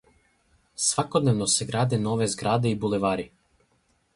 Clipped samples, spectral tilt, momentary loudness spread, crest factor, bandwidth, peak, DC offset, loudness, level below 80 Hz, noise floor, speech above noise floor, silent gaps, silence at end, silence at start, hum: under 0.1%; -4.5 dB/octave; 6 LU; 18 dB; 11.5 kHz; -8 dBFS; under 0.1%; -25 LUFS; -56 dBFS; -68 dBFS; 44 dB; none; 0.9 s; 0.8 s; none